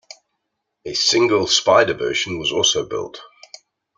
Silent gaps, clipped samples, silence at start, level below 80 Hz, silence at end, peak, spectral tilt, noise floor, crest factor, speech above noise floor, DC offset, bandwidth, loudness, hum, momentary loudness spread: none; under 0.1%; 0.85 s; -56 dBFS; 0.7 s; 0 dBFS; -2 dB/octave; -76 dBFS; 20 dB; 58 dB; under 0.1%; 9.6 kHz; -17 LUFS; none; 13 LU